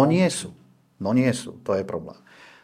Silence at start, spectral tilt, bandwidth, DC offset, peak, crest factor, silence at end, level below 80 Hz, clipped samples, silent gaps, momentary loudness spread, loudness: 0 s; -6 dB/octave; 14.5 kHz; under 0.1%; -4 dBFS; 20 dB; 0.5 s; -64 dBFS; under 0.1%; none; 14 LU; -25 LUFS